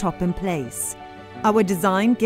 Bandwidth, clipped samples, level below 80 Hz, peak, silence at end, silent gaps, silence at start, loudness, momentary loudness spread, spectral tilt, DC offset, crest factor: 16 kHz; under 0.1%; -46 dBFS; -6 dBFS; 0 s; none; 0 s; -22 LUFS; 11 LU; -5.5 dB/octave; under 0.1%; 16 dB